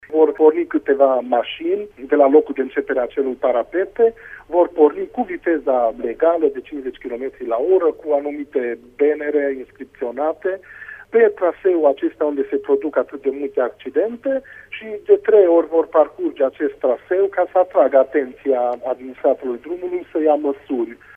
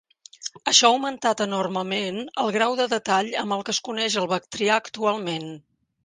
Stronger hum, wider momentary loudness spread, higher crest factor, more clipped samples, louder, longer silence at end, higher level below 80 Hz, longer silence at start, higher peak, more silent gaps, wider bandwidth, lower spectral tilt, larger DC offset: neither; about the same, 12 LU vs 12 LU; about the same, 18 dB vs 22 dB; neither; first, -19 LUFS vs -23 LUFS; second, 0.2 s vs 0.45 s; first, -58 dBFS vs -70 dBFS; second, 0.1 s vs 0.4 s; first, 0 dBFS vs -4 dBFS; neither; second, 3.6 kHz vs 10.5 kHz; first, -7 dB/octave vs -2.5 dB/octave; neither